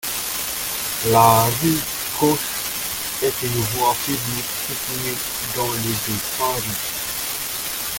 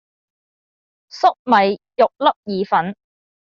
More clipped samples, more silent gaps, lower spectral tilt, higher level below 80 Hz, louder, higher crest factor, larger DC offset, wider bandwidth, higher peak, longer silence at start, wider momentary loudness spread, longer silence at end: neither; second, none vs 1.39-1.45 s, 2.36-2.43 s; about the same, -3 dB/octave vs -3 dB/octave; first, -48 dBFS vs -66 dBFS; about the same, -20 LUFS vs -18 LUFS; about the same, 20 dB vs 18 dB; neither; first, 17 kHz vs 7.4 kHz; about the same, 0 dBFS vs -2 dBFS; second, 0 s vs 1.15 s; first, 8 LU vs 5 LU; second, 0 s vs 0.55 s